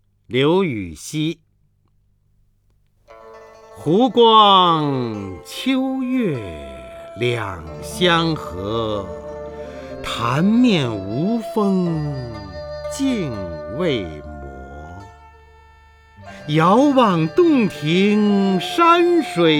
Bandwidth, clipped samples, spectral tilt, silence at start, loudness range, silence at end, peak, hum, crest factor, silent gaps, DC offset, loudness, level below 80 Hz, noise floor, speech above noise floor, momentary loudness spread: 16.5 kHz; under 0.1%; -6 dB/octave; 0.3 s; 10 LU; 0 s; 0 dBFS; 50 Hz at -45 dBFS; 18 dB; none; under 0.1%; -18 LUFS; -46 dBFS; -60 dBFS; 43 dB; 19 LU